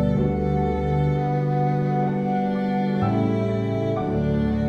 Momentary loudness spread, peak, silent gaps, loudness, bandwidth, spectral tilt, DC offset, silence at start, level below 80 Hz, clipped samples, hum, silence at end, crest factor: 2 LU; -8 dBFS; none; -23 LUFS; 6.4 kHz; -9.5 dB/octave; under 0.1%; 0 s; -36 dBFS; under 0.1%; none; 0 s; 12 dB